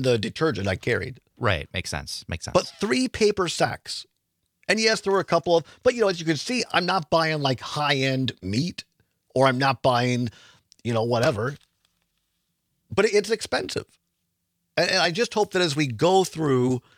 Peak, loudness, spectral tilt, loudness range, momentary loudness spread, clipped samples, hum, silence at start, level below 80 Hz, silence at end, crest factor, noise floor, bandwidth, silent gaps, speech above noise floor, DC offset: -4 dBFS; -24 LUFS; -4.5 dB/octave; 4 LU; 11 LU; under 0.1%; none; 0 s; -56 dBFS; 0.2 s; 20 dB; -76 dBFS; 16 kHz; none; 53 dB; under 0.1%